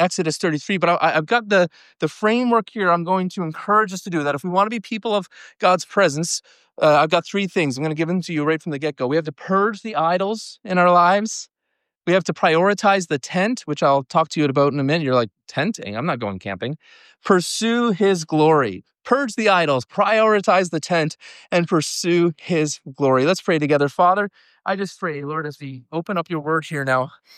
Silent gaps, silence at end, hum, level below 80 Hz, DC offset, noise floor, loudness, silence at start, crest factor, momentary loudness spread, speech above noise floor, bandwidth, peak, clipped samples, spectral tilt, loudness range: none; 0.3 s; none; -70 dBFS; under 0.1%; -77 dBFS; -20 LUFS; 0 s; 16 dB; 10 LU; 57 dB; 14 kHz; -4 dBFS; under 0.1%; -5 dB/octave; 3 LU